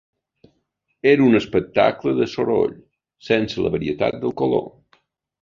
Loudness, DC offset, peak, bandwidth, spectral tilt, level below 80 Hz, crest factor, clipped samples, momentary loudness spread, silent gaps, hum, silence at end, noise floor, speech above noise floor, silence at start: -20 LUFS; under 0.1%; -2 dBFS; 7.4 kHz; -7 dB/octave; -52 dBFS; 20 dB; under 0.1%; 7 LU; none; none; 0.75 s; -71 dBFS; 52 dB; 1.05 s